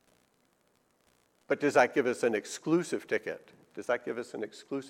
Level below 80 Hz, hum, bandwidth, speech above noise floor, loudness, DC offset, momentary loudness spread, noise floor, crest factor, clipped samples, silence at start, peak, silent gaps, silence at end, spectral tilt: -78 dBFS; none; 15.5 kHz; 40 dB; -31 LUFS; under 0.1%; 16 LU; -71 dBFS; 22 dB; under 0.1%; 1.5 s; -10 dBFS; none; 0 s; -4.5 dB/octave